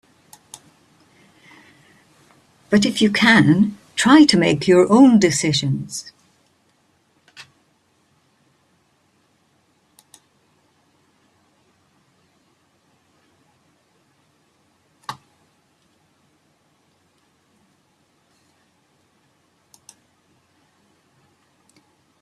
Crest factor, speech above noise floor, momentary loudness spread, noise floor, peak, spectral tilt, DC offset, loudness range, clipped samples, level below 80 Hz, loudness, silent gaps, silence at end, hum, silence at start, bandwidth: 22 dB; 48 dB; 30 LU; -63 dBFS; -2 dBFS; -5 dB/octave; under 0.1%; 13 LU; under 0.1%; -60 dBFS; -15 LUFS; none; 7.1 s; none; 2.7 s; 13 kHz